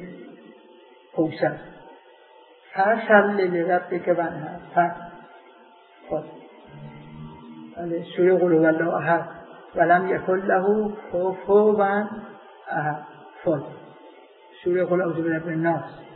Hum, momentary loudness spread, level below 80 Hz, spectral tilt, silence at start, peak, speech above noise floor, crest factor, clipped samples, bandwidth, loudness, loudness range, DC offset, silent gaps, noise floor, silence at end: none; 24 LU; -64 dBFS; -11 dB/octave; 0 s; -2 dBFS; 30 dB; 22 dB; under 0.1%; 4.4 kHz; -23 LUFS; 7 LU; under 0.1%; none; -51 dBFS; 0 s